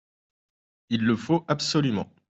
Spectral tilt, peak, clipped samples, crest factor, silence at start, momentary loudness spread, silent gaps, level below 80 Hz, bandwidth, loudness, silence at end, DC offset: -5.5 dB/octave; -8 dBFS; under 0.1%; 20 dB; 0.9 s; 4 LU; none; -64 dBFS; 8.2 kHz; -25 LUFS; 0.25 s; under 0.1%